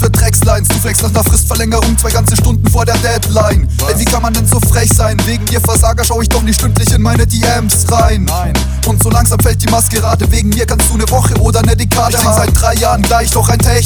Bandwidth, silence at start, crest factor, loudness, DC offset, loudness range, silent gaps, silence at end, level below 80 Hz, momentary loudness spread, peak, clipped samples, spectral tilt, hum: over 20 kHz; 0 s; 10 dB; -10 LUFS; under 0.1%; 1 LU; none; 0 s; -16 dBFS; 3 LU; 0 dBFS; 0.3%; -4.5 dB/octave; none